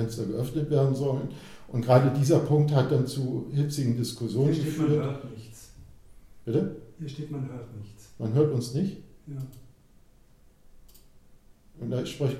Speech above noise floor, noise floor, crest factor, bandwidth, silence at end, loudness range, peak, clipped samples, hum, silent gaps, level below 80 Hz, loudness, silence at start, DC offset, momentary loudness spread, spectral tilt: 30 dB; -57 dBFS; 20 dB; 14.5 kHz; 0 s; 11 LU; -8 dBFS; under 0.1%; none; none; -56 dBFS; -27 LUFS; 0 s; under 0.1%; 20 LU; -7.5 dB/octave